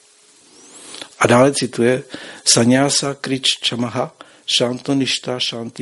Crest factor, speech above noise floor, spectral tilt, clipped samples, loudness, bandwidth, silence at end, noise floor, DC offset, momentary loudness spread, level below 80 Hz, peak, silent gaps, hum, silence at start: 18 dB; 33 dB; -3.5 dB/octave; under 0.1%; -17 LUFS; 11.5 kHz; 0 s; -50 dBFS; under 0.1%; 16 LU; -58 dBFS; 0 dBFS; none; none; 0.75 s